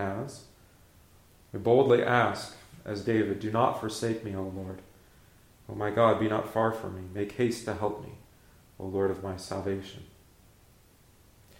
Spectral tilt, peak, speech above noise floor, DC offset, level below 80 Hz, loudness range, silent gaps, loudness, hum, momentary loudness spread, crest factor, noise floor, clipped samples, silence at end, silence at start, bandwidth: -6 dB/octave; -10 dBFS; 31 dB; under 0.1%; -62 dBFS; 8 LU; none; -29 LUFS; none; 19 LU; 22 dB; -59 dBFS; under 0.1%; 1.55 s; 0 s; 16.5 kHz